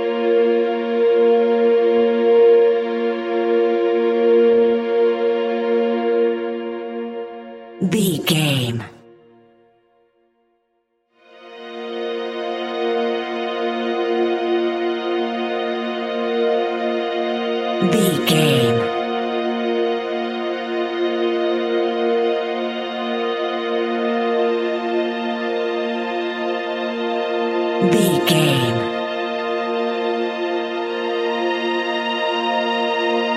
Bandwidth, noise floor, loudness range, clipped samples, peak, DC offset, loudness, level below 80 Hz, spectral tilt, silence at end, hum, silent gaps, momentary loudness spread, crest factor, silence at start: 15.5 kHz; -68 dBFS; 8 LU; under 0.1%; -2 dBFS; under 0.1%; -19 LUFS; -64 dBFS; -5.5 dB/octave; 0 s; none; none; 9 LU; 16 dB; 0 s